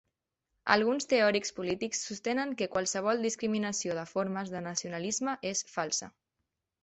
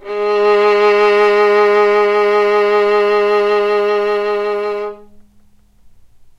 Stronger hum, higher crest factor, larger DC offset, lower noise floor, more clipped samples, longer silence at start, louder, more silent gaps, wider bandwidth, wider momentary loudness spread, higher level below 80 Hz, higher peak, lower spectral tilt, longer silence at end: neither; first, 24 dB vs 12 dB; neither; first, -85 dBFS vs -47 dBFS; neither; first, 0.65 s vs 0 s; second, -31 LUFS vs -13 LUFS; neither; first, 8.6 kHz vs 7.6 kHz; about the same, 8 LU vs 7 LU; second, -70 dBFS vs -54 dBFS; second, -8 dBFS vs -2 dBFS; second, -3 dB/octave vs -4.5 dB/octave; second, 0.75 s vs 1.15 s